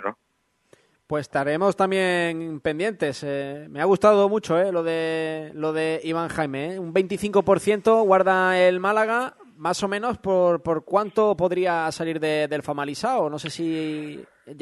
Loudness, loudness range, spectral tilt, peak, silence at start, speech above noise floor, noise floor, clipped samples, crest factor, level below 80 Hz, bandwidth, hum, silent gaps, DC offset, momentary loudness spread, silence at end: -23 LUFS; 4 LU; -5.5 dB/octave; -4 dBFS; 0 s; 48 dB; -70 dBFS; under 0.1%; 18 dB; -60 dBFS; 12 kHz; none; none; under 0.1%; 11 LU; 0.05 s